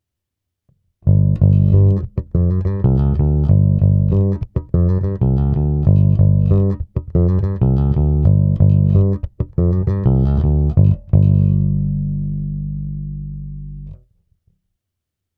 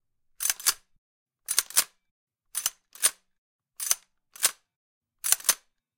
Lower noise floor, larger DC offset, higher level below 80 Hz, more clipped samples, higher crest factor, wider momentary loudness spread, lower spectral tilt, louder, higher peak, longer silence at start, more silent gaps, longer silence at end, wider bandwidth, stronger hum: first, -80 dBFS vs -47 dBFS; neither; first, -24 dBFS vs -72 dBFS; neither; second, 16 dB vs 30 dB; about the same, 11 LU vs 12 LU; first, -13 dB/octave vs 3.5 dB/octave; first, -16 LUFS vs -27 LUFS; about the same, 0 dBFS vs -2 dBFS; first, 1.05 s vs 0.4 s; second, none vs 0.98-1.26 s, 2.11-2.27 s, 3.38-3.59 s, 4.76-5.01 s; first, 1.45 s vs 0.4 s; second, 2 kHz vs 17 kHz; neither